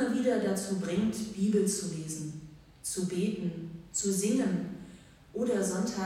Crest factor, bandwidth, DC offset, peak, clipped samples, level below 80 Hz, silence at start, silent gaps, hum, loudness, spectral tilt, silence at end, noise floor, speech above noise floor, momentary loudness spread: 16 dB; 16.5 kHz; under 0.1%; -16 dBFS; under 0.1%; -62 dBFS; 0 s; none; none; -31 LUFS; -5 dB/octave; 0 s; -53 dBFS; 22 dB; 13 LU